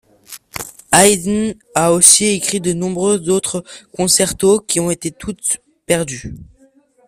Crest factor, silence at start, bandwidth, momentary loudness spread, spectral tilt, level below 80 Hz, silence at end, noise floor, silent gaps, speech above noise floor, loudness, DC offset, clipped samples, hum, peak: 16 dB; 0.3 s; 16 kHz; 19 LU; -3 dB/octave; -46 dBFS; 0.65 s; -52 dBFS; none; 37 dB; -14 LUFS; under 0.1%; 0.1%; none; 0 dBFS